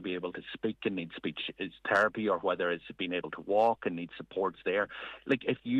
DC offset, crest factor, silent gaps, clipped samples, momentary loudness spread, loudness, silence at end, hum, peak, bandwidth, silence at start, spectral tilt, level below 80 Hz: under 0.1%; 20 dB; none; under 0.1%; 10 LU; -32 LUFS; 0 s; none; -12 dBFS; 10 kHz; 0 s; -6 dB/octave; -70 dBFS